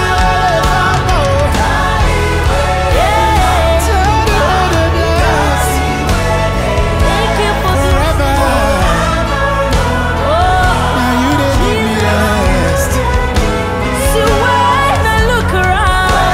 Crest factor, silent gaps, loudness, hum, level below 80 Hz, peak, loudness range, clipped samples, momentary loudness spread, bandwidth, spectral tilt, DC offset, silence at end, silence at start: 10 dB; none; -12 LUFS; none; -16 dBFS; 0 dBFS; 1 LU; under 0.1%; 3 LU; 16 kHz; -5 dB/octave; under 0.1%; 0 s; 0 s